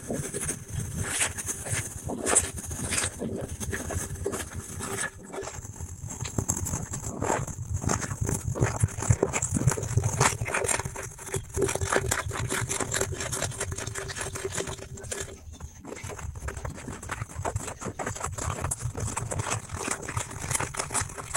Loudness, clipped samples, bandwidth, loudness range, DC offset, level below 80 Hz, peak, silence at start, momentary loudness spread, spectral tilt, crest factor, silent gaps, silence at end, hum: -30 LUFS; under 0.1%; 17 kHz; 8 LU; under 0.1%; -44 dBFS; -6 dBFS; 0 s; 11 LU; -3.5 dB/octave; 26 dB; none; 0 s; none